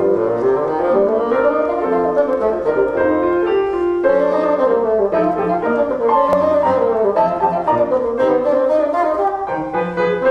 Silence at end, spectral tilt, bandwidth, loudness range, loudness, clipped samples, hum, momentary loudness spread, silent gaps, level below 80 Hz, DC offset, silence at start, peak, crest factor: 0 s; -8 dB/octave; 8.2 kHz; 1 LU; -16 LUFS; under 0.1%; none; 3 LU; none; -48 dBFS; under 0.1%; 0 s; -2 dBFS; 12 dB